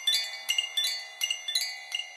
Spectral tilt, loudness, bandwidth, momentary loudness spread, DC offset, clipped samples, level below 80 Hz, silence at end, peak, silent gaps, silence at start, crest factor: 7.5 dB/octave; -28 LUFS; 16 kHz; 5 LU; under 0.1%; under 0.1%; under -90 dBFS; 0 s; -14 dBFS; none; 0 s; 18 dB